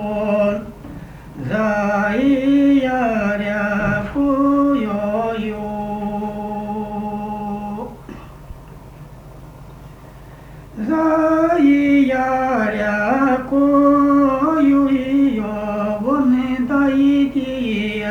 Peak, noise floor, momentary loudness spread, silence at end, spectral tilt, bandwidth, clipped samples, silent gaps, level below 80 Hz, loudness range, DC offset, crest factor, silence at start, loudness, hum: -4 dBFS; -39 dBFS; 13 LU; 0 s; -7.5 dB/octave; 6.8 kHz; under 0.1%; none; -42 dBFS; 13 LU; under 0.1%; 14 dB; 0 s; -17 LUFS; none